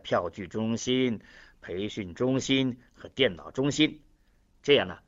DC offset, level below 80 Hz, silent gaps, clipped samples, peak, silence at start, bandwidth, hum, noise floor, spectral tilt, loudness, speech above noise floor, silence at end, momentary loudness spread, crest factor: under 0.1%; -58 dBFS; none; under 0.1%; -8 dBFS; 0.05 s; 8 kHz; none; -64 dBFS; -4.5 dB/octave; -28 LUFS; 35 dB; 0.1 s; 14 LU; 20 dB